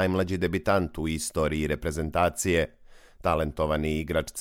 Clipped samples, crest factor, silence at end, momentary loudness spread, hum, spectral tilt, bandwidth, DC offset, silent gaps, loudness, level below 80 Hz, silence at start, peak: under 0.1%; 18 dB; 0 s; 5 LU; none; -5 dB/octave; 17 kHz; under 0.1%; none; -27 LUFS; -42 dBFS; 0 s; -10 dBFS